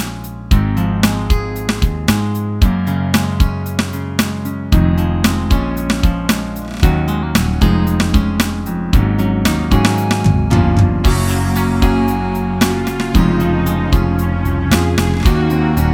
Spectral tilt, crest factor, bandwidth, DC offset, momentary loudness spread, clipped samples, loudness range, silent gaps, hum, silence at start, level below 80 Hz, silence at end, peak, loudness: -6 dB/octave; 14 dB; 18.5 kHz; under 0.1%; 5 LU; under 0.1%; 2 LU; none; none; 0 s; -20 dBFS; 0 s; 0 dBFS; -15 LUFS